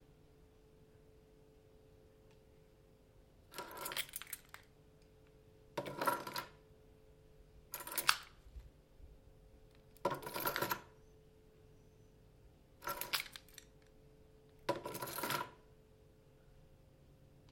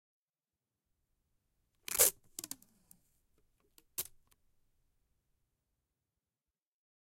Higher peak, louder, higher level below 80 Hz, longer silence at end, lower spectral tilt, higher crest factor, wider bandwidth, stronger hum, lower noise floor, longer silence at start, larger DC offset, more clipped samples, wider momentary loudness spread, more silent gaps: first, -8 dBFS vs -12 dBFS; second, -41 LUFS vs -33 LUFS; first, -66 dBFS vs -72 dBFS; second, 0 s vs 3 s; first, -2 dB/octave vs 0.5 dB/octave; first, 40 dB vs 32 dB; about the same, 16.5 kHz vs 16.5 kHz; neither; second, -66 dBFS vs under -90 dBFS; second, 0 s vs 1.9 s; neither; neither; first, 27 LU vs 20 LU; neither